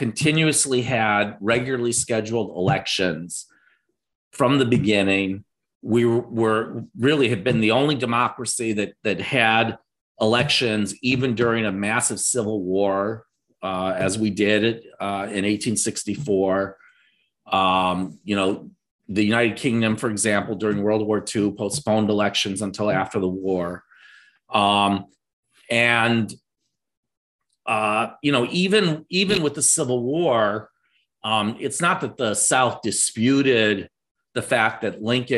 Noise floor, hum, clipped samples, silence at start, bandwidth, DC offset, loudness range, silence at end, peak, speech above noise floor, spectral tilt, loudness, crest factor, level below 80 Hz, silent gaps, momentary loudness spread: -79 dBFS; none; under 0.1%; 0 s; 13 kHz; under 0.1%; 3 LU; 0 s; -2 dBFS; 58 dB; -4 dB/octave; -21 LUFS; 20 dB; -58 dBFS; 4.15-4.31 s, 5.75-5.81 s, 10.01-10.15 s, 18.91-18.99 s, 25.33-25.43 s, 26.97-27.03 s, 27.17-27.39 s, 34.11-34.15 s; 9 LU